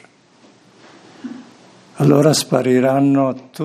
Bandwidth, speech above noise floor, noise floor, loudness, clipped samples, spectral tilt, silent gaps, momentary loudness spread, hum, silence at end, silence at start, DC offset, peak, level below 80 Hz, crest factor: 15 kHz; 36 dB; -50 dBFS; -15 LUFS; under 0.1%; -6 dB/octave; none; 21 LU; none; 0 s; 1.25 s; under 0.1%; 0 dBFS; -64 dBFS; 18 dB